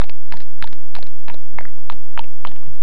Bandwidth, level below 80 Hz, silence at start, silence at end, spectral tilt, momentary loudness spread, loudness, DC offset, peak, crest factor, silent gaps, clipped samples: 11.5 kHz; -48 dBFS; 0 s; 0 s; -6 dB/octave; 7 LU; -37 LUFS; 70%; 0 dBFS; 32 dB; none; under 0.1%